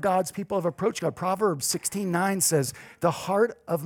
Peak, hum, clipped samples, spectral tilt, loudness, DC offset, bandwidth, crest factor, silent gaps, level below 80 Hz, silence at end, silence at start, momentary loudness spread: -8 dBFS; none; under 0.1%; -4 dB/octave; -26 LUFS; under 0.1%; 20 kHz; 18 dB; none; -66 dBFS; 0 s; 0 s; 6 LU